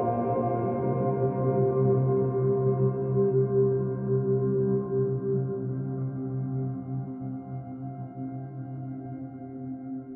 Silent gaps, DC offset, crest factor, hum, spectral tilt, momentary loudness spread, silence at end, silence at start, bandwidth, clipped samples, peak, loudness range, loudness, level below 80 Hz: none; under 0.1%; 14 dB; none; -13.5 dB/octave; 13 LU; 0 s; 0 s; 2.5 kHz; under 0.1%; -14 dBFS; 10 LU; -28 LUFS; -60 dBFS